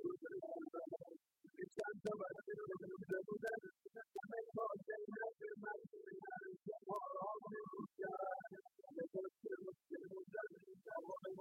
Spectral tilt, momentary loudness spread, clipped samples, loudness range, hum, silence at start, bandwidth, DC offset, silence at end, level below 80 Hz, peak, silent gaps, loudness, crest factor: -7 dB/octave; 9 LU; under 0.1%; 2 LU; none; 0 s; 16 kHz; under 0.1%; 0 s; under -90 dBFS; -32 dBFS; none; -50 LUFS; 16 dB